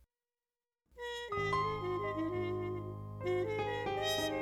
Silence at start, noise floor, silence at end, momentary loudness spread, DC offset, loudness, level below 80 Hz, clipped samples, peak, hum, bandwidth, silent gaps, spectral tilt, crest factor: 0.95 s; under -90 dBFS; 0 s; 9 LU; under 0.1%; -37 LUFS; -60 dBFS; under 0.1%; -24 dBFS; none; 16.5 kHz; none; -5 dB/octave; 14 dB